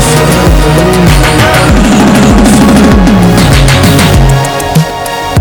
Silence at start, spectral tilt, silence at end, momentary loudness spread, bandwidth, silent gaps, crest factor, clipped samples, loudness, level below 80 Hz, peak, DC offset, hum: 0 s; -5.5 dB/octave; 0 s; 5 LU; over 20 kHz; none; 4 dB; 8%; -5 LUFS; -12 dBFS; 0 dBFS; under 0.1%; none